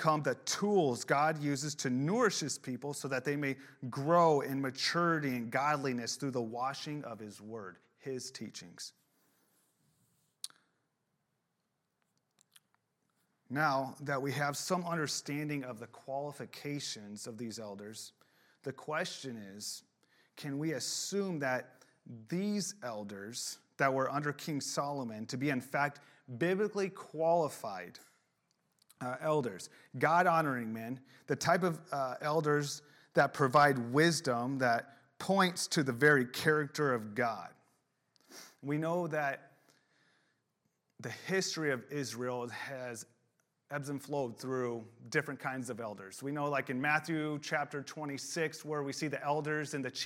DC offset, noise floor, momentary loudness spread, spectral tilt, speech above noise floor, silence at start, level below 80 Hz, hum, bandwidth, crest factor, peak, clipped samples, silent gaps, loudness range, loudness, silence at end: under 0.1%; -83 dBFS; 16 LU; -4.5 dB/octave; 49 dB; 0 s; -82 dBFS; none; 17 kHz; 22 dB; -14 dBFS; under 0.1%; none; 11 LU; -34 LUFS; 0 s